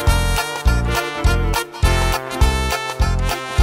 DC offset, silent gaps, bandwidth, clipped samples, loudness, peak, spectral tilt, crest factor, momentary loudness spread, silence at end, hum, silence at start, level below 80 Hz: under 0.1%; none; 16.5 kHz; under 0.1%; -19 LUFS; -2 dBFS; -4.5 dB/octave; 16 dB; 4 LU; 0 s; none; 0 s; -20 dBFS